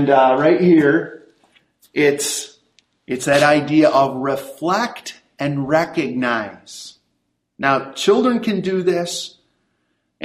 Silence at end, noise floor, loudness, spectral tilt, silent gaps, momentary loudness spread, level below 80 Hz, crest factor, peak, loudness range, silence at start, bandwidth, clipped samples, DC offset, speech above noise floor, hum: 0 s; -71 dBFS; -17 LUFS; -5 dB/octave; none; 19 LU; -60 dBFS; 18 dB; 0 dBFS; 4 LU; 0 s; 15 kHz; under 0.1%; under 0.1%; 54 dB; none